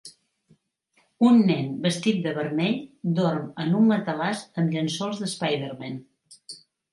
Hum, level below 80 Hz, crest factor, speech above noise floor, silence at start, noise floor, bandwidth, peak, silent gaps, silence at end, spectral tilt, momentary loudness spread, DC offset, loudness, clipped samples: none; -72 dBFS; 16 dB; 44 dB; 0.05 s; -67 dBFS; 11.5 kHz; -8 dBFS; none; 0.35 s; -6 dB/octave; 17 LU; under 0.1%; -24 LUFS; under 0.1%